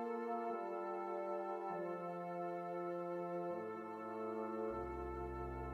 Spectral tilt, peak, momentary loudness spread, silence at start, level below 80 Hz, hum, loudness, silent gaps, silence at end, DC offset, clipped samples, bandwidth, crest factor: -8.5 dB/octave; -30 dBFS; 3 LU; 0 s; -60 dBFS; none; -44 LUFS; none; 0 s; under 0.1%; under 0.1%; 10 kHz; 12 dB